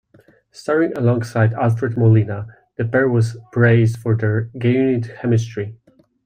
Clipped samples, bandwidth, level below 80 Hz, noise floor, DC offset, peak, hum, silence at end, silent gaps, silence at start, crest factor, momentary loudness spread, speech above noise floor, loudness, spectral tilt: under 0.1%; 9.2 kHz; -56 dBFS; -53 dBFS; under 0.1%; -4 dBFS; none; 0.5 s; none; 0.55 s; 14 dB; 12 LU; 36 dB; -18 LUFS; -8.5 dB/octave